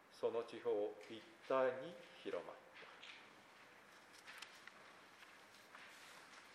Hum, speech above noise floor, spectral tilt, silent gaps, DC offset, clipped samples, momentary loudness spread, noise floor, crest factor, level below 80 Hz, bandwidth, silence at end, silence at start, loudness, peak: none; 20 dB; -4 dB/octave; none; under 0.1%; under 0.1%; 20 LU; -64 dBFS; 22 dB; under -90 dBFS; 15 kHz; 0 s; 0 s; -46 LUFS; -26 dBFS